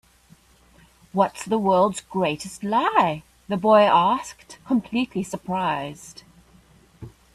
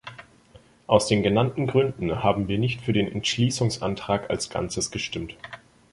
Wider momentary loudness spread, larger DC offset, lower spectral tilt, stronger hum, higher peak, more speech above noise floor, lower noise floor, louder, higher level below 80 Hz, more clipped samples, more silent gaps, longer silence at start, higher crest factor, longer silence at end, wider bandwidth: first, 17 LU vs 13 LU; neither; about the same, -5.5 dB/octave vs -5 dB/octave; neither; about the same, -4 dBFS vs -2 dBFS; about the same, 33 dB vs 30 dB; about the same, -55 dBFS vs -54 dBFS; about the same, -22 LUFS vs -24 LUFS; second, -58 dBFS vs -48 dBFS; neither; neither; first, 1.15 s vs 0.05 s; about the same, 18 dB vs 22 dB; about the same, 0.25 s vs 0.35 s; first, 14 kHz vs 11.5 kHz